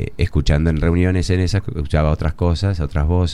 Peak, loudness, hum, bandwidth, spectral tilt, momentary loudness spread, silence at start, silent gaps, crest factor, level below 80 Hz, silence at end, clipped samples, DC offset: -2 dBFS; -19 LUFS; none; 10.5 kHz; -7 dB/octave; 4 LU; 0 s; none; 14 dB; -24 dBFS; 0 s; under 0.1%; 2%